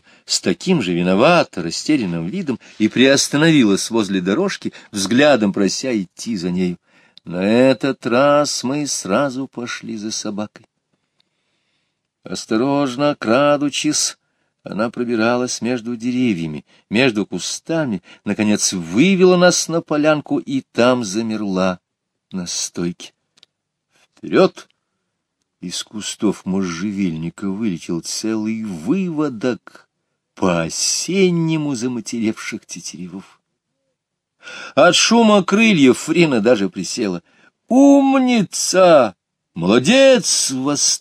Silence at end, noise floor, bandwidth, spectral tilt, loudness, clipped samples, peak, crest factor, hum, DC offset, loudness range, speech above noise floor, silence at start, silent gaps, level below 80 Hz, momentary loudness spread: 0.05 s; -76 dBFS; 15 kHz; -4 dB/octave; -17 LUFS; under 0.1%; 0 dBFS; 18 dB; none; under 0.1%; 9 LU; 59 dB; 0.3 s; none; -60 dBFS; 15 LU